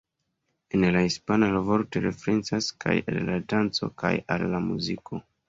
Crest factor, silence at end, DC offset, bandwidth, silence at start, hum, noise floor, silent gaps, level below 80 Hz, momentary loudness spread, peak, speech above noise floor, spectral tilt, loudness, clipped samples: 18 dB; 0.3 s; under 0.1%; 7.8 kHz; 0.75 s; none; -78 dBFS; none; -54 dBFS; 6 LU; -8 dBFS; 52 dB; -5.5 dB/octave; -26 LUFS; under 0.1%